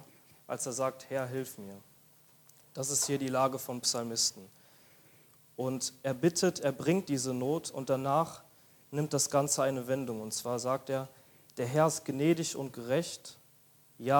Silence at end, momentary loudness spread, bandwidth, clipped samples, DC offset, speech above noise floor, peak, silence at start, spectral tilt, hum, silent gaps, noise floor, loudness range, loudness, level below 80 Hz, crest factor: 0 s; 12 LU; 19 kHz; under 0.1%; under 0.1%; 30 dB; -12 dBFS; 0 s; -4 dB/octave; none; none; -63 dBFS; 2 LU; -32 LUFS; -76 dBFS; 22 dB